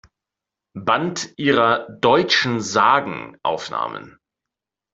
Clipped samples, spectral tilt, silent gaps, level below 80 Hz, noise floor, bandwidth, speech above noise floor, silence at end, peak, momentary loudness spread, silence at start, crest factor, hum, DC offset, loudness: under 0.1%; -4 dB/octave; none; -60 dBFS; -86 dBFS; 8 kHz; 67 dB; 0.85 s; -2 dBFS; 12 LU; 0.75 s; 18 dB; none; under 0.1%; -19 LUFS